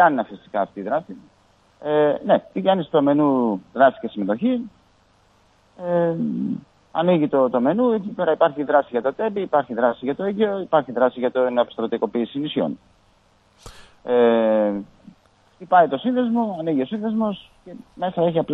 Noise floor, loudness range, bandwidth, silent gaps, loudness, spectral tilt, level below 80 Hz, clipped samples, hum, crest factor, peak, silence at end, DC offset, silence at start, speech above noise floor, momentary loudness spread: -58 dBFS; 3 LU; 7.6 kHz; none; -21 LUFS; -8.5 dB/octave; -62 dBFS; under 0.1%; none; 18 dB; -2 dBFS; 0 s; under 0.1%; 0 s; 38 dB; 10 LU